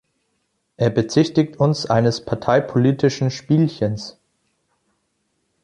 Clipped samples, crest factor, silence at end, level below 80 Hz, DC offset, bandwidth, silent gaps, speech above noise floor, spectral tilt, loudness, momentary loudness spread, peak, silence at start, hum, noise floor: under 0.1%; 18 dB; 1.55 s; -54 dBFS; under 0.1%; 10.5 kHz; none; 52 dB; -7 dB/octave; -19 LUFS; 7 LU; -2 dBFS; 0.8 s; none; -71 dBFS